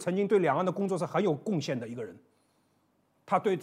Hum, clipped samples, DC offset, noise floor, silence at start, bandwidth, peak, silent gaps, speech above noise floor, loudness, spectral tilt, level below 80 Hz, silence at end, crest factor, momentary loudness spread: none; under 0.1%; under 0.1%; -71 dBFS; 0 s; 13 kHz; -12 dBFS; none; 42 dB; -29 LUFS; -6.5 dB/octave; -80 dBFS; 0 s; 18 dB; 13 LU